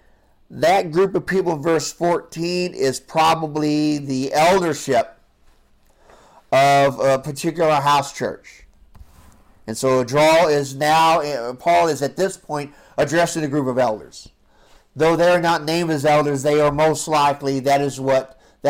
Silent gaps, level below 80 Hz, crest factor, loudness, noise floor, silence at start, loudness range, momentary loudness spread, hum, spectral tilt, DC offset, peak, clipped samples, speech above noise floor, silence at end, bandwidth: none; -52 dBFS; 10 dB; -18 LUFS; -55 dBFS; 0.5 s; 3 LU; 9 LU; none; -4.5 dB/octave; under 0.1%; -10 dBFS; under 0.1%; 37 dB; 0 s; 16.5 kHz